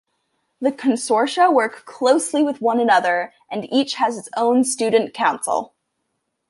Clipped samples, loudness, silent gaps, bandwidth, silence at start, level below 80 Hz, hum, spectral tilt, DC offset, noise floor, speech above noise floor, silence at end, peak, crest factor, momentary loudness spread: under 0.1%; -19 LUFS; none; 11.5 kHz; 0.6 s; -72 dBFS; none; -3 dB/octave; under 0.1%; -74 dBFS; 56 dB; 0.85 s; -4 dBFS; 16 dB; 8 LU